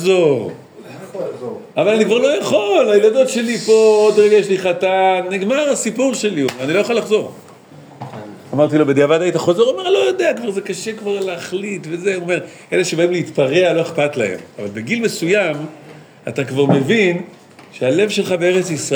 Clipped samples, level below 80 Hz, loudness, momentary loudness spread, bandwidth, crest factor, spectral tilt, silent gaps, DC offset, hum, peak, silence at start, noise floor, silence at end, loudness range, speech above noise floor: under 0.1%; -72 dBFS; -16 LUFS; 15 LU; over 20 kHz; 16 dB; -5 dB/octave; none; under 0.1%; none; 0 dBFS; 0 s; -40 dBFS; 0 s; 6 LU; 25 dB